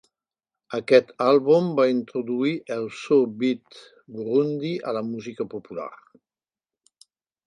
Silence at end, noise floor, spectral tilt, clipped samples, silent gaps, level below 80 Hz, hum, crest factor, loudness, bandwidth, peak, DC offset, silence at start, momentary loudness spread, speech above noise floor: 1.5 s; under -90 dBFS; -7 dB/octave; under 0.1%; none; -74 dBFS; none; 20 dB; -23 LUFS; 10 kHz; -4 dBFS; under 0.1%; 0.7 s; 15 LU; over 67 dB